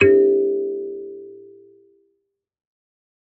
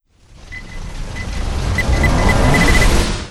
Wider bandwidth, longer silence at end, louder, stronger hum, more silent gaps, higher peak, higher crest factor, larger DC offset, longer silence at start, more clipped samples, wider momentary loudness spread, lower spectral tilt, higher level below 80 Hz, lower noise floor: second, 3.2 kHz vs 15 kHz; first, 1.9 s vs 0 s; second, -19 LUFS vs -15 LUFS; neither; neither; about the same, -2 dBFS vs 0 dBFS; about the same, 20 dB vs 16 dB; neither; second, 0 s vs 0.45 s; neither; first, 23 LU vs 19 LU; about the same, -5.5 dB/octave vs -5 dB/octave; second, -66 dBFS vs -18 dBFS; first, -74 dBFS vs -41 dBFS